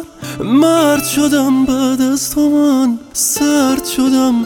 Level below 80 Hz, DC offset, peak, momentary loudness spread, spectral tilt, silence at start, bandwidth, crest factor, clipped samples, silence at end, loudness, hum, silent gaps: -44 dBFS; under 0.1%; -2 dBFS; 4 LU; -3.5 dB/octave; 0 s; 18.5 kHz; 12 dB; under 0.1%; 0 s; -13 LUFS; none; none